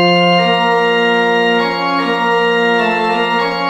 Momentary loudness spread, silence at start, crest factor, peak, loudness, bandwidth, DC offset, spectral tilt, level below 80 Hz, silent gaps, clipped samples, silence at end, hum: 4 LU; 0 s; 12 dB; -2 dBFS; -13 LUFS; 16 kHz; under 0.1%; -5.5 dB/octave; -54 dBFS; none; under 0.1%; 0 s; none